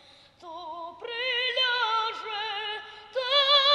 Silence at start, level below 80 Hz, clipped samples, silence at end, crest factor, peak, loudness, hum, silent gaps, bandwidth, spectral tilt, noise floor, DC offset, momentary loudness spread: 0.4 s; -74 dBFS; under 0.1%; 0 s; 18 dB; -10 dBFS; -26 LUFS; none; none; 11 kHz; 0 dB/octave; -49 dBFS; under 0.1%; 18 LU